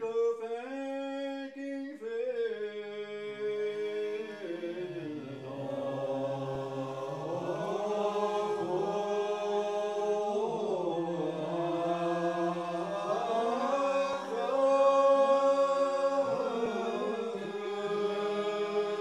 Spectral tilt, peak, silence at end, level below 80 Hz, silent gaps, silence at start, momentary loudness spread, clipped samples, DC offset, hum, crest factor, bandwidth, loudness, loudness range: -5.5 dB/octave; -16 dBFS; 0 s; -78 dBFS; none; 0 s; 11 LU; under 0.1%; under 0.1%; none; 16 dB; 11 kHz; -32 LUFS; 9 LU